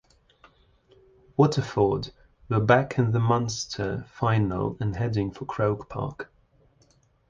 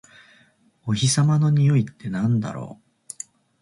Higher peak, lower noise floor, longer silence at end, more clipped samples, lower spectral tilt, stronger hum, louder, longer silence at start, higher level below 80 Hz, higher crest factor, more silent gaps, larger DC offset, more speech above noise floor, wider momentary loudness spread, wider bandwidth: first, -6 dBFS vs -10 dBFS; first, -63 dBFS vs -59 dBFS; first, 1.05 s vs 0.85 s; neither; about the same, -6.5 dB/octave vs -5.5 dB/octave; neither; second, -26 LUFS vs -21 LUFS; first, 1.4 s vs 0.85 s; first, -50 dBFS vs -58 dBFS; first, 22 dB vs 14 dB; neither; neither; about the same, 38 dB vs 39 dB; second, 12 LU vs 19 LU; second, 7.6 kHz vs 11.5 kHz